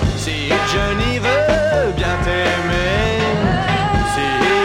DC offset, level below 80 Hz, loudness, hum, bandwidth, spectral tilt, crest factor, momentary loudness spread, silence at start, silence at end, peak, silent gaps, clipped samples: under 0.1%; -28 dBFS; -17 LUFS; none; 16 kHz; -5 dB/octave; 14 dB; 3 LU; 0 s; 0 s; -4 dBFS; none; under 0.1%